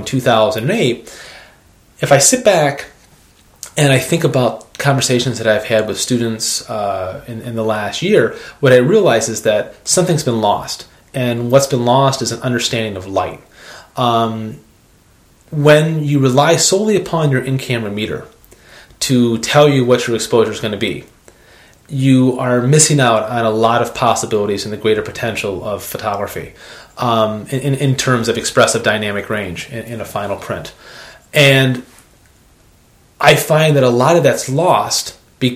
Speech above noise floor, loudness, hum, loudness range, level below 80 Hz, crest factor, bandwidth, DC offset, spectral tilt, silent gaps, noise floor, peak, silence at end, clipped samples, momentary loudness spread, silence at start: 35 dB; -14 LUFS; none; 4 LU; -50 dBFS; 16 dB; 16 kHz; under 0.1%; -4.5 dB/octave; none; -49 dBFS; 0 dBFS; 0 s; under 0.1%; 15 LU; 0 s